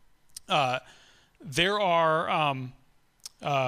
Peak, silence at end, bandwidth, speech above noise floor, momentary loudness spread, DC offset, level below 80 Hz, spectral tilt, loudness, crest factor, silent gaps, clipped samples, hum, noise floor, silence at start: -8 dBFS; 0 s; 15.5 kHz; 30 dB; 23 LU; under 0.1%; -62 dBFS; -4 dB/octave; -27 LUFS; 20 dB; none; under 0.1%; none; -56 dBFS; 0.5 s